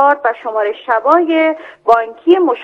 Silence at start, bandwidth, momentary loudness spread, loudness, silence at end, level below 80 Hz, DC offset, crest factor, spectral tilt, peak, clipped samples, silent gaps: 0 s; 5.4 kHz; 6 LU; -14 LUFS; 0 s; -62 dBFS; under 0.1%; 12 dB; -4.5 dB/octave; 0 dBFS; 0.2%; none